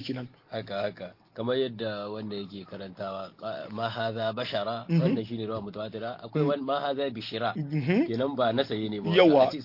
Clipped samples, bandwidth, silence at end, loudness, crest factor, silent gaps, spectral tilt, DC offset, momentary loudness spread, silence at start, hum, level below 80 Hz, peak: under 0.1%; 5.8 kHz; 0 s; -29 LUFS; 20 dB; none; -8 dB/octave; under 0.1%; 12 LU; 0 s; none; -70 dBFS; -8 dBFS